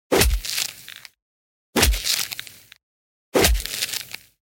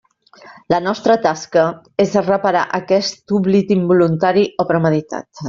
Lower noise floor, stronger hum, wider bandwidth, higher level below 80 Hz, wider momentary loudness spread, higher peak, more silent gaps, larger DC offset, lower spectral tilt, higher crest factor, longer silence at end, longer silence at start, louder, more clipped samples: about the same, -43 dBFS vs -44 dBFS; neither; first, 17 kHz vs 7.6 kHz; first, -30 dBFS vs -56 dBFS; first, 19 LU vs 5 LU; about the same, -2 dBFS vs -2 dBFS; first, 1.22-1.73 s, 2.83-3.32 s vs none; neither; second, -2.5 dB/octave vs -6 dB/octave; first, 22 dB vs 14 dB; first, 0.3 s vs 0 s; second, 0.1 s vs 0.45 s; second, -21 LUFS vs -16 LUFS; neither